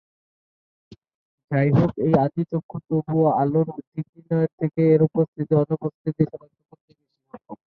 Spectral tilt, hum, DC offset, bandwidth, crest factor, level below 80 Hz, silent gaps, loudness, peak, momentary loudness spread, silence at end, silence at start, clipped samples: -11.5 dB/octave; none; under 0.1%; 4.6 kHz; 18 dB; -56 dBFS; 2.63-2.69 s, 3.87-3.92 s, 4.09-4.13 s, 4.53-4.58 s, 5.28-5.33 s, 5.94-6.05 s, 6.81-6.88 s; -22 LUFS; -4 dBFS; 14 LU; 0.25 s; 1.5 s; under 0.1%